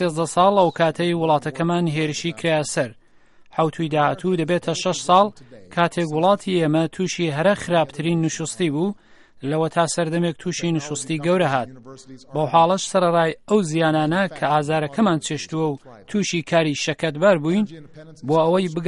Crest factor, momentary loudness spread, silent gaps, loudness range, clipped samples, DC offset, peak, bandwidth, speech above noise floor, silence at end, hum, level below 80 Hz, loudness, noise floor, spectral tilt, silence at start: 18 dB; 8 LU; none; 3 LU; under 0.1%; under 0.1%; -2 dBFS; 11.5 kHz; 30 dB; 0 s; none; -60 dBFS; -21 LUFS; -50 dBFS; -5 dB/octave; 0 s